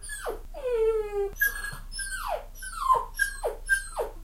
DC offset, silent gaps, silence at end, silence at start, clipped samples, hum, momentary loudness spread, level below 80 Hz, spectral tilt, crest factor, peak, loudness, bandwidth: under 0.1%; none; 0 s; 0 s; under 0.1%; none; 10 LU; -42 dBFS; -2 dB/octave; 18 dB; -12 dBFS; -29 LUFS; 16 kHz